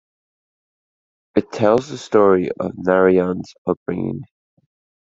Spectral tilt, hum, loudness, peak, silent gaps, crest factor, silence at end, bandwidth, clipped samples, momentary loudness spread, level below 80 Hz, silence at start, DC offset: -7 dB/octave; none; -18 LUFS; -2 dBFS; 3.58-3.65 s, 3.77-3.86 s; 18 dB; 0.8 s; 7.8 kHz; under 0.1%; 11 LU; -60 dBFS; 1.35 s; under 0.1%